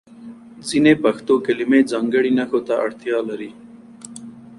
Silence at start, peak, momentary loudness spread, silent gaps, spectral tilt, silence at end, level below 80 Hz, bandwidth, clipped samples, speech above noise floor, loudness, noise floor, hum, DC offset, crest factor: 0.2 s; -2 dBFS; 22 LU; none; -5.5 dB/octave; 0.05 s; -60 dBFS; 11.5 kHz; under 0.1%; 22 dB; -18 LUFS; -40 dBFS; none; under 0.1%; 18 dB